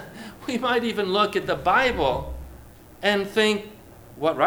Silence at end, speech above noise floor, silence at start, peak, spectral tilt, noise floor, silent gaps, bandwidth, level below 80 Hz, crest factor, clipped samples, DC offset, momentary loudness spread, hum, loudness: 0 s; 23 dB; 0 s; -6 dBFS; -4.5 dB/octave; -46 dBFS; none; over 20 kHz; -44 dBFS; 18 dB; under 0.1%; under 0.1%; 18 LU; none; -23 LUFS